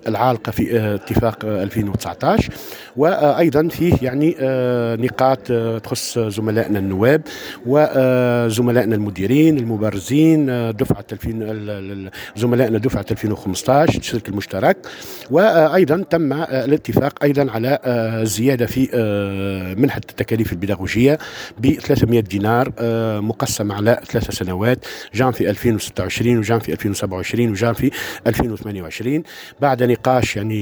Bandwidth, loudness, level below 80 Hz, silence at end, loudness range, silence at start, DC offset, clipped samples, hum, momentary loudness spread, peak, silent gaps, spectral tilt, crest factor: over 20 kHz; -18 LUFS; -42 dBFS; 0 s; 3 LU; 0.05 s; under 0.1%; under 0.1%; none; 9 LU; 0 dBFS; none; -6.5 dB/octave; 16 dB